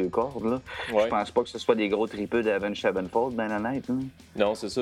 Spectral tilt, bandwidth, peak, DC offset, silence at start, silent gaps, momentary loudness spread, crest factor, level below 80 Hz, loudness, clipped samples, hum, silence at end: -5.5 dB/octave; 12.5 kHz; -8 dBFS; under 0.1%; 0 s; none; 5 LU; 20 dB; -56 dBFS; -27 LUFS; under 0.1%; none; 0 s